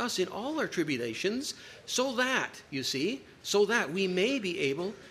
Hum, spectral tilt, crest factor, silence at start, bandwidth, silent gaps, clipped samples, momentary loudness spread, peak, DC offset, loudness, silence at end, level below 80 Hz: none; -3.5 dB/octave; 18 dB; 0 s; 15.5 kHz; none; under 0.1%; 8 LU; -12 dBFS; under 0.1%; -31 LUFS; 0 s; -70 dBFS